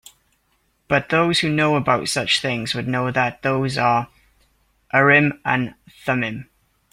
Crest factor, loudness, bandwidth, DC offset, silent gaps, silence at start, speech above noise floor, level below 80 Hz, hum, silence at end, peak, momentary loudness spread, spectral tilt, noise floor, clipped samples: 20 dB; -19 LUFS; 16 kHz; under 0.1%; none; 0.9 s; 46 dB; -54 dBFS; none; 0.5 s; -2 dBFS; 9 LU; -4.5 dB/octave; -66 dBFS; under 0.1%